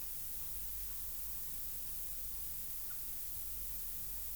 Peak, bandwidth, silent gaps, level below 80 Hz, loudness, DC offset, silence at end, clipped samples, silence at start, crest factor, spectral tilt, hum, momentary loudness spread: -28 dBFS; over 20 kHz; none; -56 dBFS; -39 LUFS; 0.1%; 0 s; under 0.1%; 0 s; 14 dB; -1.5 dB/octave; none; 0 LU